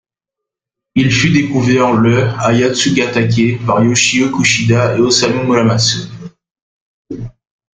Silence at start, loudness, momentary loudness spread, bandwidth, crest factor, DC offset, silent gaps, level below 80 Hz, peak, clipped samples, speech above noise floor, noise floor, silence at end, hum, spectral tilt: 0.95 s; -12 LUFS; 17 LU; 9.6 kHz; 14 dB; under 0.1%; 6.51-6.55 s, 6.62-7.05 s; -44 dBFS; 0 dBFS; under 0.1%; 71 dB; -82 dBFS; 0.45 s; none; -4.5 dB/octave